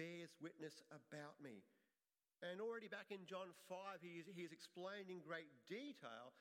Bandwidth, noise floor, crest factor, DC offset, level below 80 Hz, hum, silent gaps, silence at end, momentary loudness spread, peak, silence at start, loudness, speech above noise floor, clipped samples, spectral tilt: 16 kHz; under -90 dBFS; 18 dB; under 0.1%; under -90 dBFS; none; none; 0 s; 8 LU; -38 dBFS; 0 s; -55 LUFS; over 35 dB; under 0.1%; -5 dB/octave